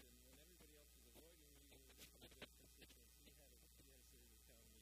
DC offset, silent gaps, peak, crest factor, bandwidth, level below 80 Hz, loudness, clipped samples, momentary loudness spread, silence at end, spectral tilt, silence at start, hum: under 0.1%; none; -44 dBFS; 24 dB; 15.5 kHz; -72 dBFS; -66 LUFS; under 0.1%; 5 LU; 0 s; -2.5 dB/octave; 0 s; none